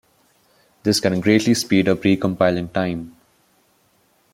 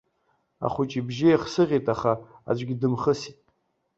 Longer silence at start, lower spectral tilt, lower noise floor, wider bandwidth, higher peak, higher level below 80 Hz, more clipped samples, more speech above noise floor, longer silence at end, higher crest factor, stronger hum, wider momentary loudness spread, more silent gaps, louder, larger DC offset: first, 0.85 s vs 0.6 s; second, -5 dB/octave vs -7 dB/octave; second, -61 dBFS vs -71 dBFS; first, 16.5 kHz vs 8 kHz; first, -2 dBFS vs -8 dBFS; about the same, -56 dBFS vs -58 dBFS; neither; second, 43 dB vs 47 dB; first, 1.25 s vs 0.65 s; about the same, 18 dB vs 18 dB; neither; about the same, 9 LU vs 9 LU; neither; first, -19 LUFS vs -25 LUFS; neither